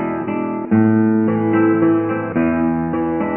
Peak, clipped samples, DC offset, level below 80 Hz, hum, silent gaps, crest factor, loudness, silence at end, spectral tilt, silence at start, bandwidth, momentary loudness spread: -4 dBFS; under 0.1%; under 0.1%; -44 dBFS; none; none; 12 dB; -17 LUFS; 0 s; -12.5 dB/octave; 0 s; 3.2 kHz; 7 LU